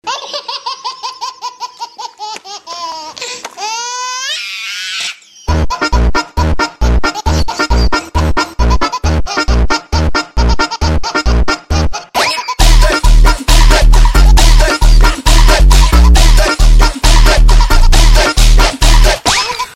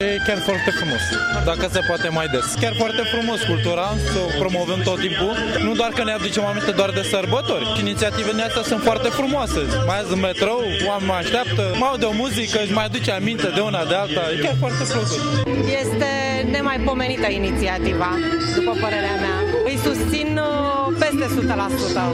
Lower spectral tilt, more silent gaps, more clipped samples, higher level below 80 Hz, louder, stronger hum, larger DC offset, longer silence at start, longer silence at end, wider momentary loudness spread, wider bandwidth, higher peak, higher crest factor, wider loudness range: about the same, -4 dB/octave vs -4.5 dB/octave; neither; neither; first, -10 dBFS vs -36 dBFS; first, -12 LUFS vs -20 LUFS; neither; neither; about the same, 0.05 s vs 0 s; about the same, 0.05 s vs 0 s; first, 13 LU vs 2 LU; about the same, 15 kHz vs 16 kHz; first, 0 dBFS vs -6 dBFS; second, 8 dB vs 14 dB; first, 11 LU vs 0 LU